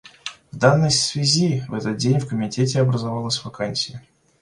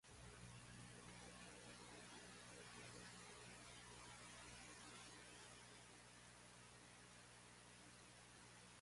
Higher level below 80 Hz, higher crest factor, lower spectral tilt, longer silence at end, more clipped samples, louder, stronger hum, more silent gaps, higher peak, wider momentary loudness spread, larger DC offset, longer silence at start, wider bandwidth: first, -56 dBFS vs -76 dBFS; about the same, 20 dB vs 16 dB; first, -4.5 dB/octave vs -3 dB/octave; first, 0.4 s vs 0 s; neither; first, -20 LUFS vs -60 LUFS; second, none vs 60 Hz at -70 dBFS; neither; first, -2 dBFS vs -44 dBFS; first, 10 LU vs 5 LU; neither; about the same, 0.05 s vs 0.05 s; about the same, 11.5 kHz vs 11.5 kHz